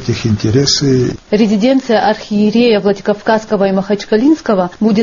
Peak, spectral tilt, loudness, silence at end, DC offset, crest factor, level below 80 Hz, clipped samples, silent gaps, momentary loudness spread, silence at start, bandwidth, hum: 0 dBFS; -5 dB/octave; -12 LUFS; 0 s; under 0.1%; 12 dB; -42 dBFS; under 0.1%; none; 4 LU; 0 s; 7.4 kHz; none